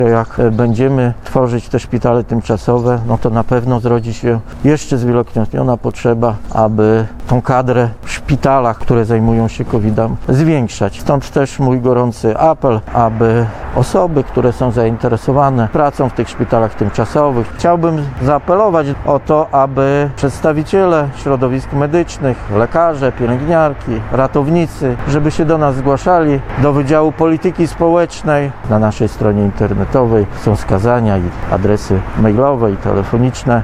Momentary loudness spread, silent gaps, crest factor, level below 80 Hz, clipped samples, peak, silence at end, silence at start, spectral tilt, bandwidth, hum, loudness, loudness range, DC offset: 5 LU; none; 12 dB; -30 dBFS; under 0.1%; 0 dBFS; 0 s; 0 s; -8 dB/octave; 11.5 kHz; none; -13 LUFS; 1 LU; under 0.1%